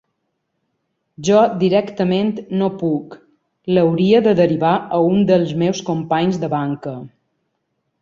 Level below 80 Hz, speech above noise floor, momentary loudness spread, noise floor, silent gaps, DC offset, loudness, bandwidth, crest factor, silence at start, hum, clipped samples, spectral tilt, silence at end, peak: -58 dBFS; 56 dB; 11 LU; -73 dBFS; none; under 0.1%; -17 LUFS; 7.6 kHz; 16 dB; 1.2 s; none; under 0.1%; -7 dB/octave; 0.95 s; -2 dBFS